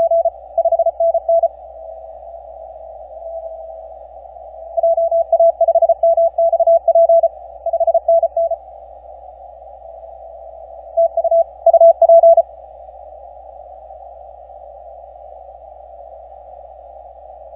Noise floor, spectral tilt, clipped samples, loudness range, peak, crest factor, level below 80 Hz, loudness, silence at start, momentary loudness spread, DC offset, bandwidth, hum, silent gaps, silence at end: -37 dBFS; -9 dB/octave; under 0.1%; 18 LU; -2 dBFS; 16 dB; -50 dBFS; -14 LUFS; 0 s; 26 LU; under 0.1%; 1 kHz; none; none; 0 s